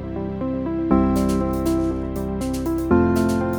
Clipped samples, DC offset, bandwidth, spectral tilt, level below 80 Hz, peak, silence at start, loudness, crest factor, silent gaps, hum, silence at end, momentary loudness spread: under 0.1%; under 0.1%; over 20 kHz; -7.5 dB/octave; -32 dBFS; -2 dBFS; 0 s; -21 LUFS; 18 dB; none; none; 0 s; 8 LU